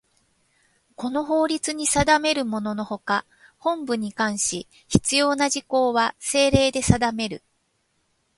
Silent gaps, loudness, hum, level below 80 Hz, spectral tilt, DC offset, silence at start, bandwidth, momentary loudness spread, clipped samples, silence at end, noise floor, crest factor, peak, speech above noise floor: none; -22 LUFS; none; -44 dBFS; -3.5 dB/octave; under 0.1%; 1 s; 11.5 kHz; 10 LU; under 0.1%; 1 s; -70 dBFS; 22 dB; 0 dBFS; 48 dB